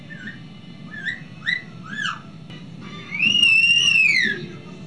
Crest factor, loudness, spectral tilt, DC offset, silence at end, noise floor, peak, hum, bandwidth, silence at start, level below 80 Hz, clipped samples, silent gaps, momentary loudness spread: 16 dB; -17 LUFS; -1.5 dB/octave; 0.4%; 0 s; -39 dBFS; -6 dBFS; none; 11 kHz; 0 s; -62 dBFS; under 0.1%; none; 24 LU